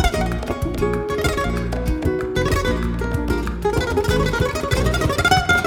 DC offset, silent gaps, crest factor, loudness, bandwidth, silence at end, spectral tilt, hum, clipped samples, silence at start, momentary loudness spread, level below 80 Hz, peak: under 0.1%; none; 18 dB; -21 LUFS; 18.5 kHz; 0 s; -5.5 dB/octave; none; under 0.1%; 0 s; 6 LU; -26 dBFS; 0 dBFS